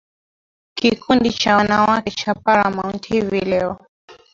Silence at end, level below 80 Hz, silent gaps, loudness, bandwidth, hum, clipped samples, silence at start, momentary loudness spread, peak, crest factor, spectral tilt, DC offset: 0.2 s; -48 dBFS; 3.89-4.08 s; -18 LUFS; 7.6 kHz; none; under 0.1%; 0.75 s; 9 LU; -2 dBFS; 18 dB; -5 dB/octave; under 0.1%